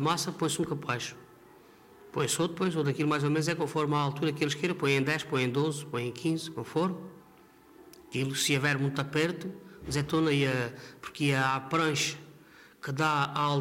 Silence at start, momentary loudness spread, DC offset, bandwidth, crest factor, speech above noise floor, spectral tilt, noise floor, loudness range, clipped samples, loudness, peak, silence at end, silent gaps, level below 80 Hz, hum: 0 s; 11 LU; under 0.1%; 16 kHz; 16 dB; 27 dB; -4.5 dB/octave; -57 dBFS; 3 LU; under 0.1%; -30 LUFS; -14 dBFS; 0 s; none; -64 dBFS; none